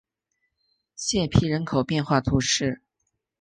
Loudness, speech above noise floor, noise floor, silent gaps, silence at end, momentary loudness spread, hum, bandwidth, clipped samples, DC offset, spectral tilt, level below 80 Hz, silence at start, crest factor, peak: -24 LUFS; 55 dB; -78 dBFS; none; 0.65 s; 8 LU; none; 10 kHz; under 0.1%; under 0.1%; -4.5 dB/octave; -44 dBFS; 1 s; 20 dB; -4 dBFS